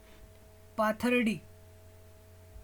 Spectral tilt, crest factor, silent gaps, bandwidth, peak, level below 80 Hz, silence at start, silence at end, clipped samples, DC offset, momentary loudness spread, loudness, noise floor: -5.5 dB/octave; 18 dB; none; 19.5 kHz; -16 dBFS; -60 dBFS; 0.2 s; 0 s; under 0.1%; under 0.1%; 13 LU; -31 LUFS; -55 dBFS